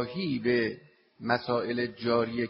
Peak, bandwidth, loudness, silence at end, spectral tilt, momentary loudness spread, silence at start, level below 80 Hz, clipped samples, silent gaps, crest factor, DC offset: -10 dBFS; 5.8 kHz; -29 LUFS; 0 s; -4 dB/octave; 7 LU; 0 s; -64 dBFS; under 0.1%; none; 20 dB; under 0.1%